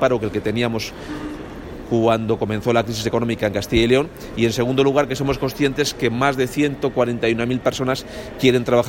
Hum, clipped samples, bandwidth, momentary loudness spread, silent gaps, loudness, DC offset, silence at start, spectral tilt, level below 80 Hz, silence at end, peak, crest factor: none; under 0.1%; 17 kHz; 11 LU; none; -20 LUFS; under 0.1%; 0 s; -5.5 dB/octave; -40 dBFS; 0 s; -2 dBFS; 18 dB